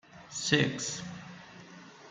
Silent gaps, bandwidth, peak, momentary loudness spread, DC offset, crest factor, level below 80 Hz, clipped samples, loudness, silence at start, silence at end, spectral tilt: none; 9.6 kHz; -8 dBFS; 23 LU; under 0.1%; 26 dB; -68 dBFS; under 0.1%; -31 LUFS; 0.1 s; 0 s; -3.5 dB/octave